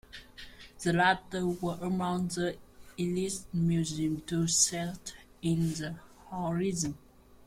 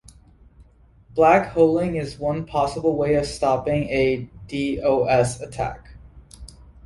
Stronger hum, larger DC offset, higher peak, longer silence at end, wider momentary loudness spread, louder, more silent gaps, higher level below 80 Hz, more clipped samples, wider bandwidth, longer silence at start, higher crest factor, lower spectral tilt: neither; neither; second, -12 dBFS vs -4 dBFS; second, 0 s vs 0.4 s; first, 21 LU vs 12 LU; second, -31 LUFS vs -21 LUFS; neither; second, -56 dBFS vs -44 dBFS; neither; first, 16 kHz vs 11.5 kHz; second, 0.15 s vs 0.6 s; about the same, 20 dB vs 20 dB; second, -4 dB/octave vs -6 dB/octave